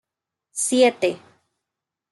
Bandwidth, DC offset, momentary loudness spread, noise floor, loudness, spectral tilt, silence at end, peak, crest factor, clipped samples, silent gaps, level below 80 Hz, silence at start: 12 kHz; under 0.1%; 16 LU; -85 dBFS; -20 LUFS; -2 dB/octave; 0.95 s; -6 dBFS; 18 dB; under 0.1%; none; -78 dBFS; 0.55 s